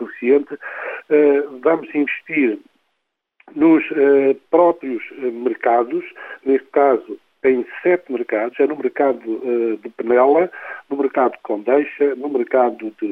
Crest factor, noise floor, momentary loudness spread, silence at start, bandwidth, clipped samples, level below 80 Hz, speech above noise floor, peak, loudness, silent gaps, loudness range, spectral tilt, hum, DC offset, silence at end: 16 dB; -74 dBFS; 12 LU; 0 s; 3.8 kHz; under 0.1%; -68 dBFS; 57 dB; -2 dBFS; -18 LUFS; none; 2 LU; -8.5 dB/octave; none; under 0.1%; 0 s